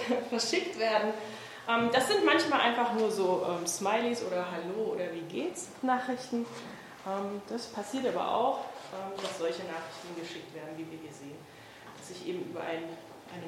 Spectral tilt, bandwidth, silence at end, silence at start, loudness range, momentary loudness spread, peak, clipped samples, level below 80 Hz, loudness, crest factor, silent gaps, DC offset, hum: -3.5 dB/octave; 16.5 kHz; 0 s; 0 s; 12 LU; 17 LU; -12 dBFS; under 0.1%; -76 dBFS; -32 LUFS; 20 dB; none; under 0.1%; none